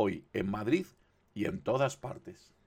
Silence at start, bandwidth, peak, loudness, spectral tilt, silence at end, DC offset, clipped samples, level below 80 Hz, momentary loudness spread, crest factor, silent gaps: 0 s; 15.5 kHz; -16 dBFS; -34 LUFS; -6.5 dB/octave; 0.3 s; under 0.1%; under 0.1%; -62 dBFS; 17 LU; 18 dB; none